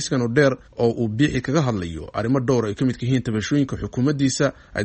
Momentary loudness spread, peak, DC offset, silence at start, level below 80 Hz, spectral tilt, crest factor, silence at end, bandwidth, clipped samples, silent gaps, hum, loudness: 5 LU; -4 dBFS; under 0.1%; 0 s; -44 dBFS; -6 dB/octave; 18 dB; 0 s; 8.8 kHz; under 0.1%; none; none; -22 LUFS